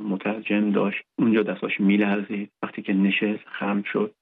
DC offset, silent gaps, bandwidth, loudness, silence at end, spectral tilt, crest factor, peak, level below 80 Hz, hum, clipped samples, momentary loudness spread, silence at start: under 0.1%; none; 4 kHz; -24 LUFS; 0.1 s; -10 dB/octave; 14 dB; -10 dBFS; -76 dBFS; none; under 0.1%; 8 LU; 0 s